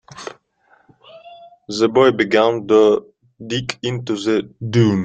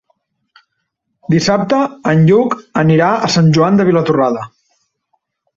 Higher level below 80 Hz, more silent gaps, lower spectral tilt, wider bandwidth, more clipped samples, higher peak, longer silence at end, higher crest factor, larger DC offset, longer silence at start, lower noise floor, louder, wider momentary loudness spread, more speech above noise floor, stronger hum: about the same, -56 dBFS vs -52 dBFS; neither; about the same, -6 dB/octave vs -6.5 dB/octave; first, 9 kHz vs 7.8 kHz; neither; about the same, -2 dBFS vs -2 dBFS; second, 0 s vs 1.1 s; first, 18 dB vs 12 dB; neither; second, 0.15 s vs 1.3 s; second, -57 dBFS vs -71 dBFS; second, -17 LUFS vs -12 LUFS; first, 18 LU vs 7 LU; second, 41 dB vs 59 dB; neither